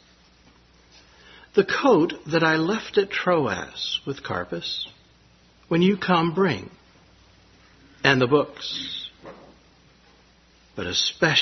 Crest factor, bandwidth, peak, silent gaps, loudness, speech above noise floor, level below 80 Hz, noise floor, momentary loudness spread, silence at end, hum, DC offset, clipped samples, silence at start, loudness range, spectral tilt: 24 dB; 6.4 kHz; 0 dBFS; none; -23 LUFS; 34 dB; -60 dBFS; -56 dBFS; 14 LU; 0 s; none; under 0.1%; under 0.1%; 1.55 s; 4 LU; -5 dB/octave